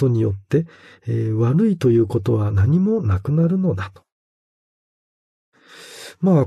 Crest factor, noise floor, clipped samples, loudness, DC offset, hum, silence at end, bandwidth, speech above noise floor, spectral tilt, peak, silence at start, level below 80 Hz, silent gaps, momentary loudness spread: 16 dB; -42 dBFS; under 0.1%; -19 LUFS; under 0.1%; none; 0 s; 12 kHz; 24 dB; -9 dB/octave; -4 dBFS; 0 s; -50 dBFS; 4.12-5.52 s; 17 LU